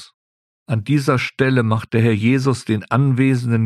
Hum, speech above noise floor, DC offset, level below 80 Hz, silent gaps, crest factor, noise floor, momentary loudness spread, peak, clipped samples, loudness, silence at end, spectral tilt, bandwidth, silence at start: none; over 73 dB; under 0.1%; -54 dBFS; 0.14-0.66 s; 16 dB; under -90 dBFS; 4 LU; -2 dBFS; under 0.1%; -18 LUFS; 0 s; -7.5 dB/octave; 12.5 kHz; 0 s